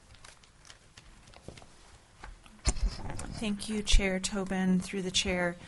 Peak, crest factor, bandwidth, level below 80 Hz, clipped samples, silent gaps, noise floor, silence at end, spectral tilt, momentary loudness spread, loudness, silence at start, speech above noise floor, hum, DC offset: -10 dBFS; 24 dB; 11.5 kHz; -36 dBFS; under 0.1%; none; -56 dBFS; 0 s; -4 dB/octave; 24 LU; -32 LUFS; 0.1 s; 27 dB; none; under 0.1%